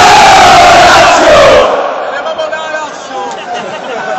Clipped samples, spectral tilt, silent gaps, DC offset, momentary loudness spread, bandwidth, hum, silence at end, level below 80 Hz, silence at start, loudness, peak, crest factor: 0.9%; -2.5 dB/octave; none; under 0.1%; 17 LU; 15.5 kHz; none; 0 s; -32 dBFS; 0 s; -4 LUFS; 0 dBFS; 6 dB